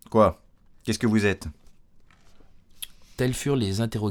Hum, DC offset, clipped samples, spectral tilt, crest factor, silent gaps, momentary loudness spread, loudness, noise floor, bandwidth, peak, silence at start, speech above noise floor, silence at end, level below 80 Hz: none; under 0.1%; under 0.1%; -6 dB/octave; 20 dB; none; 18 LU; -25 LUFS; -53 dBFS; 18 kHz; -6 dBFS; 0.1 s; 30 dB; 0 s; -48 dBFS